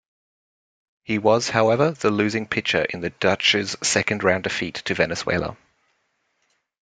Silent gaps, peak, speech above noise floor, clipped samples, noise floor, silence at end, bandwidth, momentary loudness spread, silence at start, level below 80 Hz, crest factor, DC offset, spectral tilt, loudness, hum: none; -2 dBFS; 49 dB; under 0.1%; -70 dBFS; 1.35 s; 9.6 kHz; 8 LU; 1.1 s; -56 dBFS; 22 dB; under 0.1%; -3.5 dB/octave; -21 LUFS; none